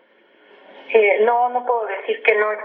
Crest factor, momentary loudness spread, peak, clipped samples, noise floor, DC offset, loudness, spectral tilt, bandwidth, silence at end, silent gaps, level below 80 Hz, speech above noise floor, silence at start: 20 dB; 7 LU; 0 dBFS; under 0.1%; -54 dBFS; under 0.1%; -18 LUFS; -6 dB/octave; 4.2 kHz; 0 s; none; under -90 dBFS; 36 dB; 0.75 s